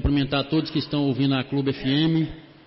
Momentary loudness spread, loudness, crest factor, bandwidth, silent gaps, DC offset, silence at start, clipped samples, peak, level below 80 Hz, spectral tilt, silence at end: 4 LU; -23 LUFS; 12 dB; 5.8 kHz; none; under 0.1%; 0 s; under 0.1%; -12 dBFS; -38 dBFS; -10.5 dB/octave; 0.25 s